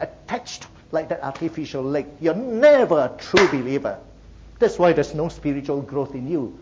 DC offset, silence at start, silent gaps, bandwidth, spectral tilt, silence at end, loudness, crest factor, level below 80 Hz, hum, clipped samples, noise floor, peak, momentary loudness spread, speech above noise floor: under 0.1%; 0 s; none; 7.8 kHz; -5.5 dB/octave; 0 s; -21 LUFS; 18 dB; -48 dBFS; none; under 0.1%; -44 dBFS; -4 dBFS; 13 LU; 24 dB